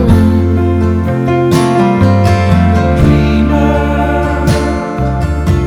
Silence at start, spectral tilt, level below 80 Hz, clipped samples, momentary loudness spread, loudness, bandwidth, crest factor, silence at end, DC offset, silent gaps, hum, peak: 0 s; -7.5 dB/octave; -18 dBFS; 0.6%; 5 LU; -11 LUFS; 14 kHz; 10 dB; 0 s; under 0.1%; none; none; 0 dBFS